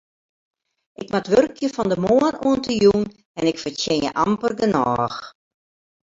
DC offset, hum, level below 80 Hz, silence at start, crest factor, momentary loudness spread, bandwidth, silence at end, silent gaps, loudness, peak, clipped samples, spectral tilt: under 0.1%; none; -52 dBFS; 1 s; 18 dB; 9 LU; 7.8 kHz; 0.75 s; 3.25-3.35 s; -20 LUFS; -4 dBFS; under 0.1%; -5.5 dB/octave